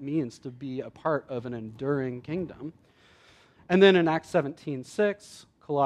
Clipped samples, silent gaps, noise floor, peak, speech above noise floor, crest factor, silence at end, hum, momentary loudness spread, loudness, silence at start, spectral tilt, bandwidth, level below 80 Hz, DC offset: under 0.1%; none; -58 dBFS; -6 dBFS; 31 dB; 22 dB; 0 s; none; 19 LU; -27 LUFS; 0 s; -6.5 dB/octave; 11 kHz; -66 dBFS; under 0.1%